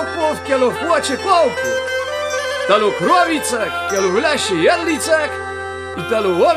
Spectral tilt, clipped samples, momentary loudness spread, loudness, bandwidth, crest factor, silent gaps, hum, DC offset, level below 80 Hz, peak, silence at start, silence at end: -3 dB/octave; under 0.1%; 7 LU; -17 LUFS; 15.5 kHz; 16 dB; none; none; under 0.1%; -50 dBFS; 0 dBFS; 0 s; 0 s